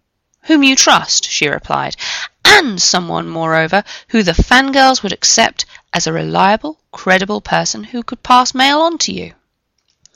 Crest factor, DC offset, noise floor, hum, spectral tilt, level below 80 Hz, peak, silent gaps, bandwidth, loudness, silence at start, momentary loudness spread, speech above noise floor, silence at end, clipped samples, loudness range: 14 dB; under 0.1%; -66 dBFS; none; -2.5 dB/octave; -32 dBFS; 0 dBFS; none; 18.5 kHz; -12 LUFS; 0.45 s; 13 LU; 53 dB; 0.85 s; 0.2%; 3 LU